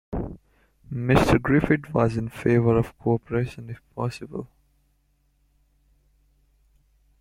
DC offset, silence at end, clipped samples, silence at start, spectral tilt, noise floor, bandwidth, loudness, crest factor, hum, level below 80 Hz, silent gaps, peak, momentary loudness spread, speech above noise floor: under 0.1%; 2.75 s; under 0.1%; 0.1 s; -7.5 dB/octave; -66 dBFS; 15.5 kHz; -24 LUFS; 24 dB; none; -42 dBFS; none; -2 dBFS; 18 LU; 44 dB